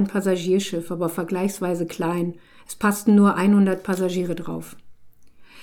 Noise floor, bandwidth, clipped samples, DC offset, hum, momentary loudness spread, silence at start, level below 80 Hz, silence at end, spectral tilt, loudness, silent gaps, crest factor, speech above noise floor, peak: -45 dBFS; 17.5 kHz; under 0.1%; under 0.1%; none; 14 LU; 0 s; -60 dBFS; 0 s; -6.5 dB/octave; -22 LUFS; none; 16 dB; 23 dB; -6 dBFS